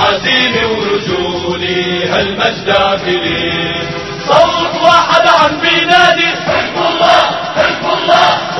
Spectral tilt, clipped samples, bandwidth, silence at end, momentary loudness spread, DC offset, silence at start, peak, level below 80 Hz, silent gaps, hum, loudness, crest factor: -4 dB/octave; 0.4%; 11 kHz; 0 s; 8 LU; 0.3%; 0 s; 0 dBFS; -40 dBFS; none; none; -11 LUFS; 12 dB